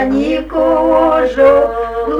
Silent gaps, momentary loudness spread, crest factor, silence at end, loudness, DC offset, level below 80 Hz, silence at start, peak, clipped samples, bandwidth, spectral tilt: none; 7 LU; 12 dB; 0 s; -12 LUFS; under 0.1%; -34 dBFS; 0 s; 0 dBFS; under 0.1%; 7.6 kHz; -6.5 dB/octave